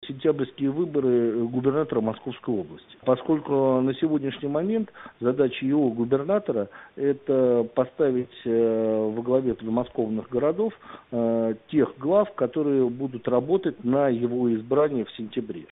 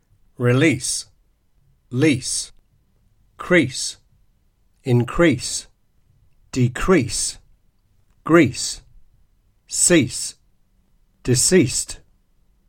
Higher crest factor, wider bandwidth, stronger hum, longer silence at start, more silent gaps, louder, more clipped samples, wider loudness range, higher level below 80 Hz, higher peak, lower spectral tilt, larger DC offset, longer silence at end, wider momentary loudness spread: about the same, 16 dB vs 20 dB; second, 4 kHz vs 16.5 kHz; neither; second, 0 s vs 0.4 s; neither; second, -25 LUFS vs -19 LUFS; neither; about the same, 2 LU vs 3 LU; second, -62 dBFS vs -42 dBFS; second, -8 dBFS vs 0 dBFS; first, -7 dB/octave vs -4 dB/octave; neither; second, 0.1 s vs 0.7 s; second, 8 LU vs 16 LU